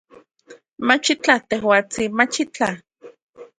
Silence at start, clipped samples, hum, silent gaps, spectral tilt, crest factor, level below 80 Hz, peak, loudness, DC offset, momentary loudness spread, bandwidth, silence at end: 0.5 s; under 0.1%; none; 3.22-3.33 s; -3 dB/octave; 22 dB; -60 dBFS; 0 dBFS; -19 LUFS; under 0.1%; 7 LU; 11 kHz; 0.15 s